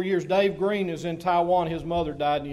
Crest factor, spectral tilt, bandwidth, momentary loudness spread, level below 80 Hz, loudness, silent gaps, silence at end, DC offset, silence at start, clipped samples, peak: 14 dB; -6.5 dB/octave; 13 kHz; 6 LU; -50 dBFS; -25 LUFS; none; 0 s; under 0.1%; 0 s; under 0.1%; -10 dBFS